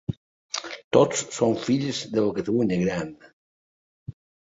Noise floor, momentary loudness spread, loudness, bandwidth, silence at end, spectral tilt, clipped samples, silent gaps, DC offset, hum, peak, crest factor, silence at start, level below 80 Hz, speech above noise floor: under -90 dBFS; 22 LU; -25 LUFS; 8 kHz; 0.35 s; -5 dB/octave; under 0.1%; 0.17-0.49 s, 0.84-0.91 s, 3.33-4.06 s; under 0.1%; none; -4 dBFS; 22 dB; 0.1 s; -56 dBFS; over 67 dB